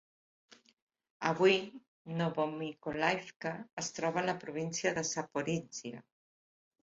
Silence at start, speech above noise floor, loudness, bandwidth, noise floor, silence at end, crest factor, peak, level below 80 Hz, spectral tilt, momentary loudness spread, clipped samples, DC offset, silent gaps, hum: 1.2 s; over 55 dB; -35 LUFS; 7.6 kHz; under -90 dBFS; 0.85 s; 22 dB; -14 dBFS; -74 dBFS; -4 dB/octave; 15 LU; under 0.1%; under 0.1%; 1.88-2.05 s, 3.36-3.40 s, 3.73-3.77 s; none